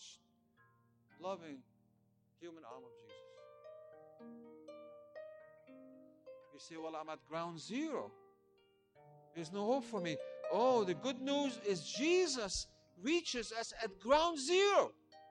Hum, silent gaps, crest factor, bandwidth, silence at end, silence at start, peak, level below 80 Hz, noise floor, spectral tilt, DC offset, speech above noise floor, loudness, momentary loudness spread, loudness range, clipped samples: none; none; 22 dB; 10.5 kHz; 0 s; 0 s; -18 dBFS; -68 dBFS; -75 dBFS; -3.5 dB/octave; under 0.1%; 37 dB; -37 LUFS; 25 LU; 21 LU; under 0.1%